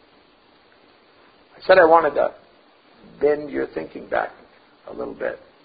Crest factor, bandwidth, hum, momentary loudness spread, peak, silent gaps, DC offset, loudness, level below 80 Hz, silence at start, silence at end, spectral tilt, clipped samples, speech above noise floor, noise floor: 22 dB; 5 kHz; none; 19 LU; -2 dBFS; none; under 0.1%; -20 LUFS; -58 dBFS; 1.6 s; 0.3 s; -9 dB/octave; under 0.1%; 36 dB; -55 dBFS